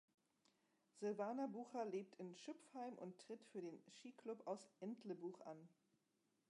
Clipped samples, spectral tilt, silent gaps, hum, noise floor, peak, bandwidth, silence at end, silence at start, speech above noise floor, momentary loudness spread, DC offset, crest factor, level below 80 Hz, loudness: under 0.1%; -6 dB/octave; none; none; -86 dBFS; -34 dBFS; 11 kHz; 0.8 s; 0.95 s; 35 dB; 12 LU; under 0.1%; 18 dB; under -90 dBFS; -52 LUFS